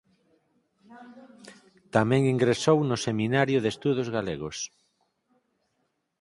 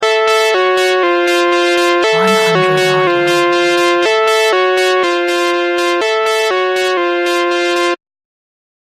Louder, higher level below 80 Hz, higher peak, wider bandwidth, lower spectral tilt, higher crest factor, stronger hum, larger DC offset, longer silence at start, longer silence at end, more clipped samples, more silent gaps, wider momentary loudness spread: second, -26 LUFS vs -12 LUFS; about the same, -62 dBFS vs -62 dBFS; second, -6 dBFS vs 0 dBFS; second, 11.5 kHz vs 15.5 kHz; first, -5.5 dB/octave vs -3.5 dB/octave; first, 22 dB vs 12 dB; neither; neither; first, 0.9 s vs 0 s; first, 1.55 s vs 0.95 s; neither; neither; first, 11 LU vs 3 LU